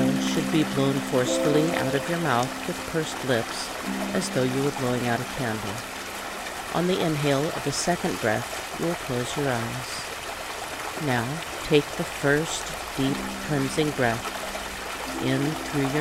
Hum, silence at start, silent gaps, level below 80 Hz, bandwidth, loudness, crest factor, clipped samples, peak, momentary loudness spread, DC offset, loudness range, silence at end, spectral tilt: none; 0 s; none; -50 dBFS; 16 kHz; -26 LUFS; 18 dB; under 0.1%; -8 dBFS; 8 LU; under 0.1%; 3 LU; 0 s; -4.5 dB/octave